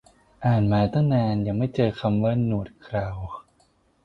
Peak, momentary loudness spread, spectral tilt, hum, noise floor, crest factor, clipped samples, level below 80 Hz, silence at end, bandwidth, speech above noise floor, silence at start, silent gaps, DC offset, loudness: -8 dBFS; 11 LU; -9.5 dB/octave; none; -63 dBFS; 16 dB; under 0.1%; -46 dBFS; 0.65 s; 5.8 kHz; 40 dB; 0.4 s; none; under 0.1%; -24 LUFS